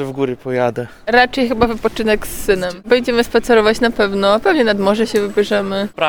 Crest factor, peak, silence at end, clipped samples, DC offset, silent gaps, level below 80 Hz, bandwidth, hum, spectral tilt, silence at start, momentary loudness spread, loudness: 14 dB; 0 dBFS; 0 s; under 0.1%; 1%; none; -38 dBFS; 19.5 kHz; none; -4.5 dB/octave; 0 s; 6 LU; -15 LUFS